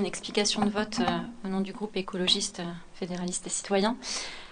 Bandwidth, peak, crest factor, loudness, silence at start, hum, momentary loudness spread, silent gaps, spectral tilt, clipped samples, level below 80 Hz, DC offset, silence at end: 10 kHz; -10 dBFS; 20 dB; -29 LUFS; 0 s; none; 9 LU; none; -3.5 dB/octave; under 0.1%; -58 dBFS; under 0.1%; 0 s